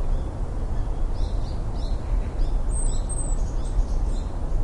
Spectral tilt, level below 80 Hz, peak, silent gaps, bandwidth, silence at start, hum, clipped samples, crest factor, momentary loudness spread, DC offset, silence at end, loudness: -5.5 dB/octave; -24 dBFS; -10 dBFS; none; 9 kHz; 0 s; none; under 0.1%; 12 dB; 3 LU; under 0.1%; 0 s; -30 LUFS